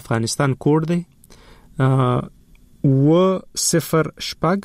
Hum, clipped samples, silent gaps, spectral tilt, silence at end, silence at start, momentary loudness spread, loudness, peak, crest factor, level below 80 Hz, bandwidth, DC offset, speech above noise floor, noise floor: none; under 0.1%; none; -5.5 dB/octave; 0.05 s; 0.05 s; 9 LU; -19 LUFS; -6 dBFS; 12 dB; -48 dBFS; 16 kHz; under 0.1%; 28 dB; -46 dBFS